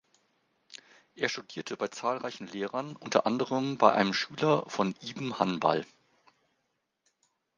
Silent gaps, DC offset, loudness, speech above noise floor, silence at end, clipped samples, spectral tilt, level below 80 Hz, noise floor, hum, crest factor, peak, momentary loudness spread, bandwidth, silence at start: none; under 0.1%; -30 LUFS; 50 dB; 1.75 s; under 0.1%; -5 dB/octave; -76 dBFS; -80 dBFS; none; 28 dB; -4 dBFS; 14 LU; 9.8 kHz; 0.7 s